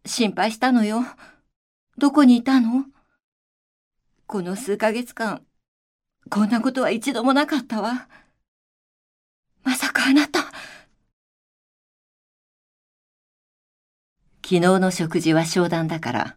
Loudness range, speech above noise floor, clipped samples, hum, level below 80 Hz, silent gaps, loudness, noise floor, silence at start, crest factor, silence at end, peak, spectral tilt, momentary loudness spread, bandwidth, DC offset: 7 LU; 25 dB; under 0.1%; none; -66 dBFS; 1.56-1.87 s, 3.24-3.91 s, 5.68-5.99 s, 8.48-9.43 s, 11.13-14.16 s; -21 LUFS; -45 dBFS; 0.05 s; 20 dB; 0.05 s; -2 dBFS; -5 dB/octave; 13 LU; 16 kHz; under 0.1%